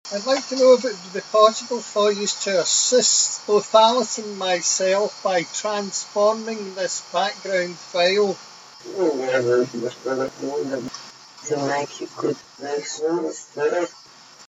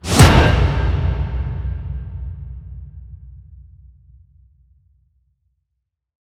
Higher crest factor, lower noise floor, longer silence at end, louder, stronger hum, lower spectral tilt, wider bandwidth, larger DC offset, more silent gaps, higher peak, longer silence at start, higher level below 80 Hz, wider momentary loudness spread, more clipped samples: about the same, 22 dB vs 20 dB; second, -41 dBFS vs -77 dBFS; second, 0.1 s vs 2.7 s; second, -21 LUFS vs -17 LUFS; neither; second, -2 dB/octave vs -5 dB/octave; second, 8 kHz vs 15.5 kHz; neither; neither; about the same, 0 dBFS vs 0 dBFS; about the same, 0.05 s vs 0.05 s; second, -76 dBFS vs -24 dBFS; second, 14 LU vs 28 LU; neither